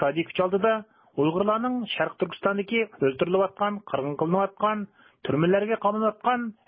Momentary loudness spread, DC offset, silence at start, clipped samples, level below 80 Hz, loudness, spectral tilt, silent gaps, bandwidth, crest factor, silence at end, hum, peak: 7 LU; under 0.1%; 0 s; under 0.1%; -64 dBFS; -26 LUFS; -10.5 dB/octave; none; 5 kHz; 16 dB; 0.15 s; none; -8 dBFS